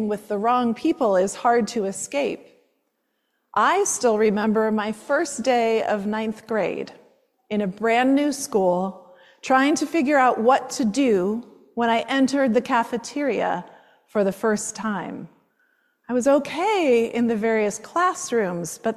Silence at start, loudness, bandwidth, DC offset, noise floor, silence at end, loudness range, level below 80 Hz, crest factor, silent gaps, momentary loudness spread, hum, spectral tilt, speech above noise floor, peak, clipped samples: 0 s; -22 LUFS; 14 kHz; under 0.1%; -73 dBFS; 0 s; 4 LU; -66 dBFS; 16 dB; none; 9 LU; none; -4.5 dB/octave; 52 dB; -6 dBFS; under 0.1%